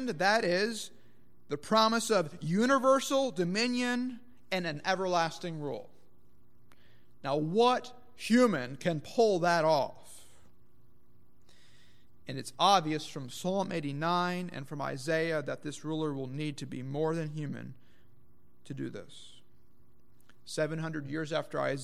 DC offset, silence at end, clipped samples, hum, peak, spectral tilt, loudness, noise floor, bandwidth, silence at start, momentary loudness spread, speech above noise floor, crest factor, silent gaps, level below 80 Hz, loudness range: 0.4%; 0 s; under 0.1%; 60 Hz at -60 dBFS; -12 dBFS; -5 dB/octave; -31 LUFS; -67 dBFS; 15.5 kHz; 0 s; 15 LU; 36 dB; 22 dB; none; -72 dBFS; 10 LU